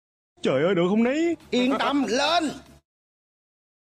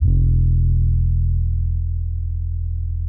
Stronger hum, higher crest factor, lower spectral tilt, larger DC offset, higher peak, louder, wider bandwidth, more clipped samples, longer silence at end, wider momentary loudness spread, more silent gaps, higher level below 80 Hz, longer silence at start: neither; about the same, 14 dB vs 12 dB; second, -5 dB/octave vs -22.5 dB/octave; neither; second, -12 dBFS vs -6 dBFS; about the same, -23 LUFS vs -21 LUFS; first, 13 kHz vs 0.6 kHz; neither; first, 1.25 s vs 0 s; about the same, 7 LU vs 8 LU; neither; second, -60 dBFS vs -20 dBFS; first, 0.45 s vs 0 s